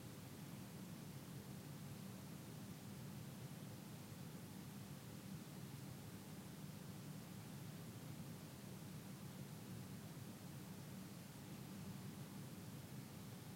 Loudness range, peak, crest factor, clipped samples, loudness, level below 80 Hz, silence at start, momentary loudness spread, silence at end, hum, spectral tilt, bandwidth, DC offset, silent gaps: 0 LU; -42 dBFS; 12 dB; under 0.1%; -54 LUFS; -78 dBFS; 0 s; 1 LU; 0 s; none; -5 dB/octave; 16 kHz; under 0.1%; none